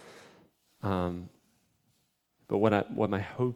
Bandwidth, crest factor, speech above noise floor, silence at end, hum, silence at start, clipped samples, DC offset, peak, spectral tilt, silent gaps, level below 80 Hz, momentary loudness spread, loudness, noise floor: 15.5 kHz; 24 dB; 45 dB; 0 s; none; 0 s; under 0.1%; under 0.1%; -10 dBFS; -8 dB/octave; none; -64 dBFS; 18 LU; -30 LUFS; -74 dBFS